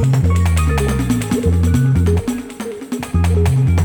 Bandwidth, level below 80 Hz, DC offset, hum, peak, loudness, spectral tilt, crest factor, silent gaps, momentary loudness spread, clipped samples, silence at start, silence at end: 19 kHz; -24 dBFS; under 0.1%; none; -4 dBFS; -16 LUFS; -7 dB/octave; 10 dB; none; 11 LU; under 0.1%; 0 s; 0 s